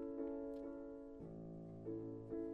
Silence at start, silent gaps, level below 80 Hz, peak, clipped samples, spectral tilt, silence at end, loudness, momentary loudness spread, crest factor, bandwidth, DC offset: 0 s; none; -68 dBFS; -34 dBFS; under 0.1%; -10.5 dB/octave; 0 s; -50 LUFS; 7 LU; 14 dB; 5.4 kHz; under 0.1%